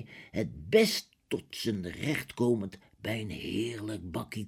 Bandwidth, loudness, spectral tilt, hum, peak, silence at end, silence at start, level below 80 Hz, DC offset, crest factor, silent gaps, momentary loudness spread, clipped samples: 17 kHz; -32 LUFS; -5 dB/octave; none; -10 dBFS; 0 s; 0 s; -58 dBFS; under 0.1%; 22 dB; none; 13 LU; under 0.1%